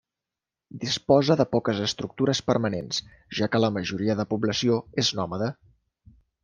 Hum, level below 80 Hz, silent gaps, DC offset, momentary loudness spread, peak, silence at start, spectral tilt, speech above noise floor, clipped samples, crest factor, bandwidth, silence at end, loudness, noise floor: none; -60 dBFS; none; under 0.1%; 10 LU; -6 dBFS; 0.75 s; -5 dB/octave; 64 dB; under 0.1%; 20 dB; 10 kHz; 0.9 s; -25 LUFS; -89 dBFS